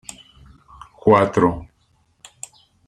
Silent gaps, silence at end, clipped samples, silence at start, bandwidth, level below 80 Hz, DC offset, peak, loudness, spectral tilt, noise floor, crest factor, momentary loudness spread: none; 1.25 s; under 0.1%; 1.05 s; 12.5 kHz; -48 dBFS; under 0.1%; -2 dBFS; -17 LUFS; -6.5 dB/octave; -62 dBFS; 20 dB; 23 LU